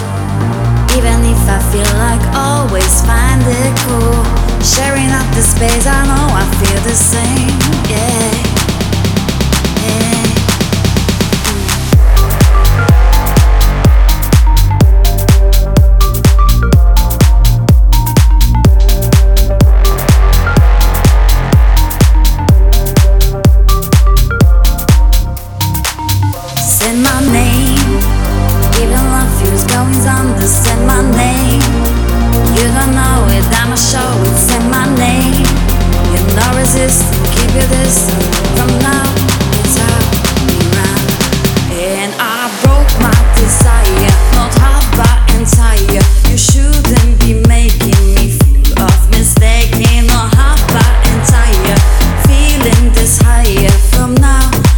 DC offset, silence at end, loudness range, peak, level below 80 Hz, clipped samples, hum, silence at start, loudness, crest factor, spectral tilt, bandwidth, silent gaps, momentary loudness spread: under 0.1%; 0 s; 2 LU; 0 dBFS; -10 dBFS; 0.4%; none; 0 s; -10 LUFS; 8 dB; -4.5 dB/octave; 20 kHz; none; 4 LU